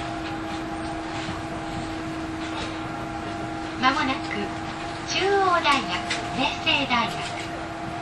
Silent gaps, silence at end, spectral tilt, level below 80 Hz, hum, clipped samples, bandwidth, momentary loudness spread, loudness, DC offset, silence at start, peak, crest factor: none; 0 s; -4 dB/octave; -46 dBFS; none; under 0.1%; 12 kHz; 11 LU; -26 LUFS; under 0.1%; 0 s; -6 dBFS; 20 dB